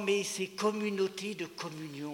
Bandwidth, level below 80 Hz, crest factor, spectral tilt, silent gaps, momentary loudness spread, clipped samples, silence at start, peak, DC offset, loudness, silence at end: 18 kHz; -80 dBFS; 16 dB; -4 dB/octave; none; 9 LU; under 0.1%; 0 s; -18 dBFS; under 0.1%; -34 LUFS; 0 s